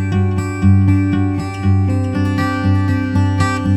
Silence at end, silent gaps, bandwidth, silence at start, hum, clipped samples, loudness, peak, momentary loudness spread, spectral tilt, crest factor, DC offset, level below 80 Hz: 0 s; none; 8.4 kHz; 0 s; none; under 0.1%; -16 LUFS; -2 dBFS; 5 LU; -7.5 dB/octave; 12 dB; under 0.1%; -38 dBFS